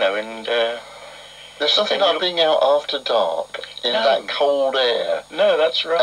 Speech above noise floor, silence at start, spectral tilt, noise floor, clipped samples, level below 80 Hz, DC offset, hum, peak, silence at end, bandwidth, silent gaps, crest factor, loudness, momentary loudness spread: 21 dB; 0 s; -2 dB/octave; -40 dBFS; under 0.1%; -64 dBFS; under 0.1%; none; -4 dBFS; 0 s; 12 kHz; none; 14 dB; -19 LUFS; 15 LU